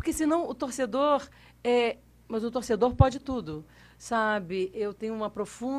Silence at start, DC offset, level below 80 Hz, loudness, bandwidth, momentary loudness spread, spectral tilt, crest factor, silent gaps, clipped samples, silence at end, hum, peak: 0 s; under 0.1%; -44 dBFS; -28 LUFS; 15 kHz; 11 LU; -6 dB/octave; 22 dB; none; under 0.1%; 0 s; none; -6 dBFS